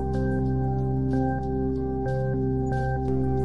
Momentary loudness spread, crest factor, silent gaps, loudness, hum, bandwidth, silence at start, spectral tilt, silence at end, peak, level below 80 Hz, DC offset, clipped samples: 2 LU; 12 dB; none; -26 LUFS; none; 5.6 kHz; 0 s; -10.5 dB/octave; 0 s; -12 dBFS; -34 dBFS; 1%; under 0.1%